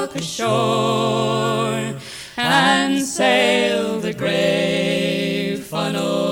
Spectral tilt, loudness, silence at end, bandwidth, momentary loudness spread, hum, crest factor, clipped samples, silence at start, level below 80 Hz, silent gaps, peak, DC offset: -4 dB/octave; -19 LUFS; 0 s; over 20 kHz; 8 LU; none; 16 dB; under 0.1%; 0 s; -56 dBFS; none; -2 dBFS; under 0.1%